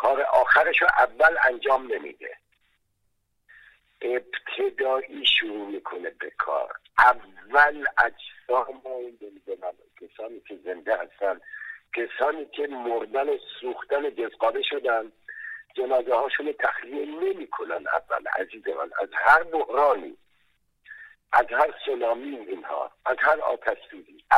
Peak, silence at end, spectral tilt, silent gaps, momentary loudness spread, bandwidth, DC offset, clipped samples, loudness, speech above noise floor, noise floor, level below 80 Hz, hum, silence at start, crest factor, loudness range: -4 dBFS; 0 s; -3 dB/octave; none; 18 LU; 12.5 kHz; under 0.1%; under 0.1%; -24 LUFS; 48 dB; -73 dBFS; -62 dBFS; none; 0 s; 22 dB; 8 LU